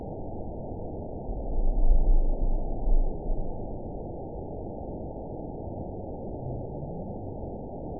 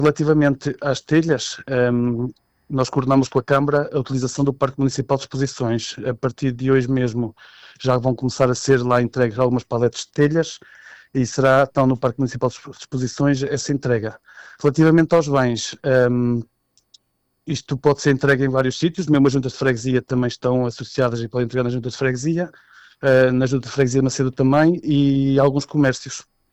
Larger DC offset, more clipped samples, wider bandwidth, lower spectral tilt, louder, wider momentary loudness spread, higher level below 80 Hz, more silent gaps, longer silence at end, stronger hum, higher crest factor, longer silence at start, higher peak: first, 0.5% vs under 0.1%; neither; second, 1 kHz vs 8.4 kHz; first, -17 dB/octave vs -6 dB/octave; second, -35 LUFS vs -19 LUFS; about the same, 9 LU vs 9 LU; first, -28 dBFS vs -46 dBFS; neither; second, 0 s vs 0.3 s; neither; about the same, 18 dB vs 14 dB; about the same, 0 s vs 0 s; second, -10 dBFS vs -6 dBFS